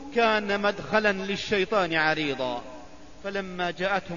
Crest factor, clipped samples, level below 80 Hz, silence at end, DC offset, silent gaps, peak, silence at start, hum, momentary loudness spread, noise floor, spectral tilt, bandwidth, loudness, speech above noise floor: 18 dB; under 0.1%; -54 dBFS; 0 s; 0.5%; none; -8 dBFS; 0 s; none; 12 LU; -46 dBFS; -4.5 dB/octave; 7.4 kHz; -26 LUFS; 20 dB